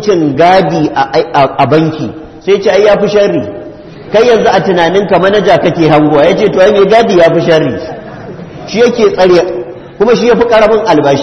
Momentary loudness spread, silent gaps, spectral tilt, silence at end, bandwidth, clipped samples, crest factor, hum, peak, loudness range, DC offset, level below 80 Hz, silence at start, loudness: 14 LU; none; -6 dB/octave; 0 s; 8.4 kHz; 0.9%; 8 dB; none; 0 dBFS; 3 LU; under 0.1%; -40 dBFS; 0 s; -8 LUFS